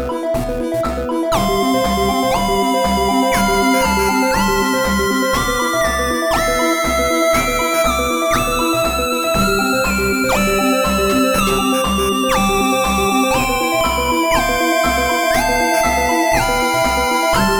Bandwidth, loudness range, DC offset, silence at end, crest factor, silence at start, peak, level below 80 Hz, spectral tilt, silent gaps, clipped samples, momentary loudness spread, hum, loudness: over 20 kHz; 1 LU; under 0.1%; 0 s; 14 dB; 0 s; -2 dBFS; -30 dBFS; -3.5 dB/octave; none; under 0.1%; 2 LU; none; -15 LUFS